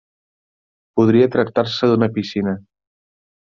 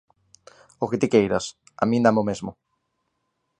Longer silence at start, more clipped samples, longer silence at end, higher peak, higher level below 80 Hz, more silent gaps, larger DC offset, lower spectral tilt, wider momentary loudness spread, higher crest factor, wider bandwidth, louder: first, 0.95 s vs 0.8 s; neither; second, 0.9 s vs 1.05 s; about the same, -2 dBFS vs -4 dBFS; about the same, -58 dBFS vs -58 dBFS; neither; neither; first, -7.5 dB/octave vs -6 dB/octave; about the same, 11 LU vs 13 LU; second, 16 dB vs 22 dB; second, 7.2 kHz vs 9.6 kHz; first, -17 LUFS vs -22 LUFS